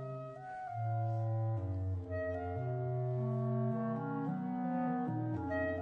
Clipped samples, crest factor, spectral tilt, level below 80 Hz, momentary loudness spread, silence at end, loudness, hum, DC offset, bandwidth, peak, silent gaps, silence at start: under 0.1%; 12 dB; -11 dB/octave; -64 dBFS; 4 LU; 0 s; -38 LUFS; none; under 0.1%; 4.7 kHz; -26 dBFS; none; 0 s